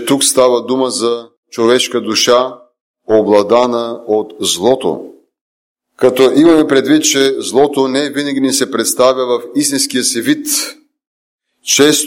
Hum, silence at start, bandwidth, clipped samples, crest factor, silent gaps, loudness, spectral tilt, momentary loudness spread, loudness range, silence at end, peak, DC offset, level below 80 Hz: none; 0 s; 17 kHz; under 0.1%; 12 dB; 1.37-1.43 s, 2.81-2.94 s, 5.41-5.75 s, 11.07-11.39 s; -12 LUFS; -2.5 dB/octave; 8 LU; 3 LU; 0 s; 0 dBFS; under 0.1%; -54 dBFS